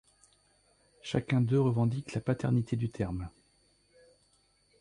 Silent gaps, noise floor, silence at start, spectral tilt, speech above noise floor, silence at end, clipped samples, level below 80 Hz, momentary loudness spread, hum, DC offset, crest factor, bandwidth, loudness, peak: none; -69 dBFS; 1.05 s; -8 dB/octave; 40 dB; 1.5 s; under 0.1%; -56 dBFS; 11 LU; 50 Hz at -60 dBFS; under 0.1%; 18 dB; 10.5 kHz; -31 LUFS; -16 dBFS